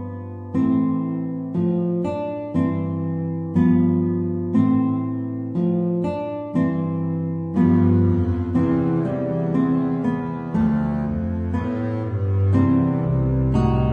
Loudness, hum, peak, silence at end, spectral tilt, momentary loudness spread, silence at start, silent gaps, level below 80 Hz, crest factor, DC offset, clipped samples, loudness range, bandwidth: -21 LUFS; none; -6 dBFS; 0 s; -11 dB/octave; 8 LU; 0 s; none; -38 dBFS; 14 dB; under 0.1%; under 0.1%; 2 LU; 4.7 kHz